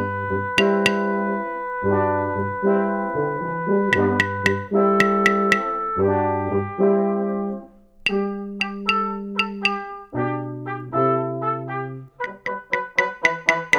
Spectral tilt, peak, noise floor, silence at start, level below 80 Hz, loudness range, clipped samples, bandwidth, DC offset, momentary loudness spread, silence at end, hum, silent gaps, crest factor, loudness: -5.5 dB/octave; -2 dBFS; -41 dBFS; 0 s; -54 dBFS; 5 LU; under 0.1%; 13 kHz; under 0.1%; 10 LU; 0 s; none; none; 20 dB; -22 LUFS